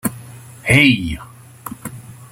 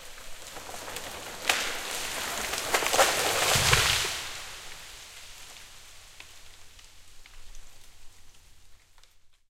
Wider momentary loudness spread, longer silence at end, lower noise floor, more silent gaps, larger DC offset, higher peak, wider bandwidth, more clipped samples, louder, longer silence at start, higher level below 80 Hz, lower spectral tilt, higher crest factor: about the same, 25 LU vs 25 LU; about the same, 0.05 s vs 0.15 s; second, -37 dBFS vs -55 dBFS; neither; neither; about the same, 0 dBFS vs -2 dBFS; about the same, 16.5 kHz vs 16.5 kHz; neither; first, -15 LUFS vs -26 LUFS; about the same, 0.05 s vs 0 s; first, -42 dBFS vs -48 dBFS; first, -4.5 dB/octave vs -1 dB/octave; second, 18 dB vs 30 dB